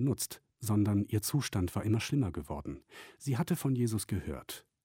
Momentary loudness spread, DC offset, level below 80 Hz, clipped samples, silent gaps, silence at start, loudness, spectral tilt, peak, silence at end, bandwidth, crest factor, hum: 12 LU; under 0.1%; -54 dBFS; under 0.1%; none; 0 s; -34 LUFS; -6 dB/octave; -18 dBFS; 0.25 s; 17 kHz; 14 dB; none